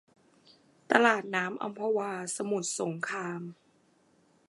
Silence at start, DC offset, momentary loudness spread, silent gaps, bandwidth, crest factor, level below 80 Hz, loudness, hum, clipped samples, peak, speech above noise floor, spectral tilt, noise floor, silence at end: 0.9 s; under 0.1%; 12 LU; none; 11.5 kHz; 28 dB; -84 dBFS; -30 LUFS; none; under 0.1%; -6 dBFS; 36 dB; -3.5 dB/octave; -67 dBFS; 0.95 s